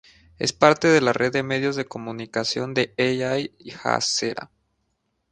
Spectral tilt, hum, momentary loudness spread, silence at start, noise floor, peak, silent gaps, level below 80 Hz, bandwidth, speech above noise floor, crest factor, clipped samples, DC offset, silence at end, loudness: -4 dB/octave; none; 12 LU; 0.4 s; -73 dBFS; 0 dBFS; none; -60 dBFS; 10 kHz; 51 dB; 24 dB; under 0.1%; under 0.1%; 0.85 s; -22 LUFS